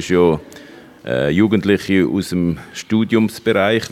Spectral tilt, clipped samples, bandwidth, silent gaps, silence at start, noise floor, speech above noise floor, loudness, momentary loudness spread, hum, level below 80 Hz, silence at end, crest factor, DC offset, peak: -6 dB/octave; under 0.1%; 15.5 kHz; none; 0 s; -40 dBFS; 24 dB; -17 LUFS; 8 LU; none; -50 dBFS; 0.05 s; 16 dB; under 0.1%; -2 dBFS